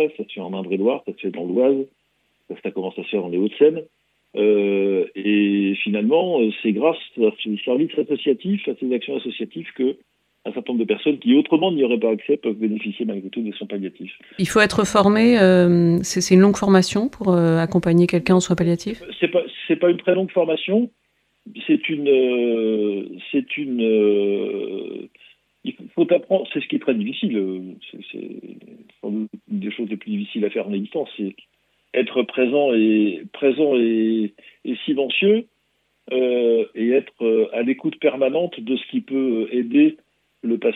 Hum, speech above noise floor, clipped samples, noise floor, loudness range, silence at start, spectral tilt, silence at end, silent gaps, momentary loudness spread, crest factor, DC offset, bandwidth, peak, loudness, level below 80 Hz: none; 48 dB; under 0.1%; -68 dBFS; 8 LU; 0 s; -6 dB/octave; 0 s; none; 13 LU; 20 dB; under 0.1%; 13.5 kHz; 0 dBFS; -20 LUFS; -58 dBFS